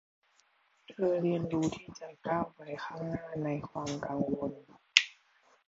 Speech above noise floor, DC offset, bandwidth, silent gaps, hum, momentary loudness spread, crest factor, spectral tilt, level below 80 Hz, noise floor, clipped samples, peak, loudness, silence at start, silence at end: 35 dB; under 0.1%; 8 kHz; none; none; 16 LU; 34 dB; -4.5 dB/octave; -66 dBFS; -70 dBFS; under 0.1%; 0 dBFS; -33 LUFS; 0.9 s; 0.55 s